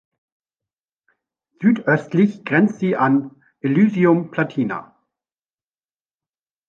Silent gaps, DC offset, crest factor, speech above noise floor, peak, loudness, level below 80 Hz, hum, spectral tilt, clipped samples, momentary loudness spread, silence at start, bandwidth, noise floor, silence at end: none; under 0.1%; 18 dB; over 73 dB; -4 dBFS; -19 LUFS; -66 dBFS; none; -9 dB/octave; under 0.1%; 9 LU; 1.6 s; 7 kHz; under -90 dBFS; 1.85 s